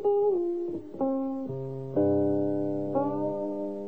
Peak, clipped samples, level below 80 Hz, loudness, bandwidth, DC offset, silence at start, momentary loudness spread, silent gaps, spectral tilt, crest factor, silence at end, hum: -16 dBFS; under 0.1%; -70 dBFS; -29 LUFS; 3.6 kHz; 0.4%; 0 s; 9 LU; none; -11.5 dB/octave; 14 dB; 0 s; none